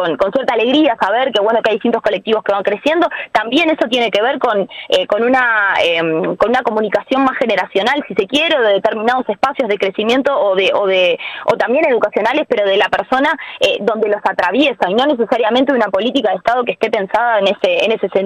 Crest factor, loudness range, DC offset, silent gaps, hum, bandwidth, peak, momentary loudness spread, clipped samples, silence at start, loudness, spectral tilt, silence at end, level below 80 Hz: 12 dB; 1 LU; under 0.1%; none; none; 12.5 kHz; -2 dBFS; 4 LU; under 0.1%; 0 s; -14 LUFS; -4.5 dB/octave; 0 s; -54 dBFS